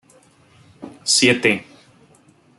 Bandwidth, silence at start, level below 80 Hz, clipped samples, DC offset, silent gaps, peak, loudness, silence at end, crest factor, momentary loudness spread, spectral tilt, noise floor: 12 kHz; 0.8 s; -64 dBFS; under 0.1%; under 0.1%; none; -2 dBFS; -17 LUFS; 0.95 s; 20 dB; 15 LU; -2.5 dB/octave; -53 dBFS